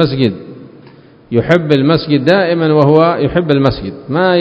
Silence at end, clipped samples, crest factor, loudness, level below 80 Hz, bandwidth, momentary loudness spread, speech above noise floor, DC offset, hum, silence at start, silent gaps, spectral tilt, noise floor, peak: 0 s; 0.2%; 12 dB; -12 LUFS; -40 dBFS; 8 kHz; 8 LU; 29 dB; under 0.1%; none; 0 s; none; -8.5 dB/octave; -40 dBFS; 0 dBFS